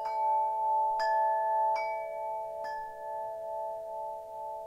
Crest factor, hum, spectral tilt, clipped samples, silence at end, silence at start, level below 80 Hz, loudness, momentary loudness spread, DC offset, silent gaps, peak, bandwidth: 12 dB; none; -2.5 dB/octave; under 0.1%; 0 s; 0 s; -70 dBFS; -32 LUFS; 11 LU; under 0.1%; none; -20 dBFS; 14.5 kHz